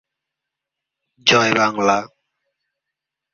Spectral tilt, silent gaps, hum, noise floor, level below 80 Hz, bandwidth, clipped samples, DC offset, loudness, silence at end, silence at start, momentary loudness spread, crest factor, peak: -3 dB/octave; none; none; -83 dBFS; -62 dBFS; 7.4 kHz; under 0.1%; under 0.1%; -16 LUFS; 1.25 s; 1.25 s; 5 LU; 22 dB; 0 dBFS